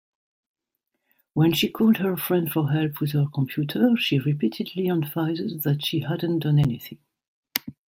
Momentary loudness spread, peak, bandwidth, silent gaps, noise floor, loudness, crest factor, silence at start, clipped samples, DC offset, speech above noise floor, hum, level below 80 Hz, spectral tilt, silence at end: 7 LU; 0 dBFS; 16.5 kHz; 7.28-7.43 s; -80 dBFS; -24 LUFS; 24 dB; 1.35 s; under 0.1%; under 0.1%; 57 dB; none; -60 dBFS; -6.5 dB/octave; 0.15 s